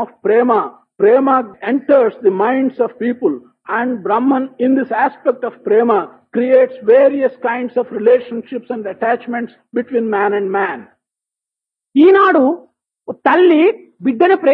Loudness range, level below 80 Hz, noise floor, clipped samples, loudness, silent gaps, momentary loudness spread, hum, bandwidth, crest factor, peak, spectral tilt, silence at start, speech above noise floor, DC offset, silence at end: 4 LU; -72 dBFS; -86 dBFS; under 0.1%; -14 LUFS; none; 12 LU; none; 4.7 kHz; 14 dB; 0 dBFS; -9 dB/octave; 0 s; 72 dB; under 0.1%; 0 s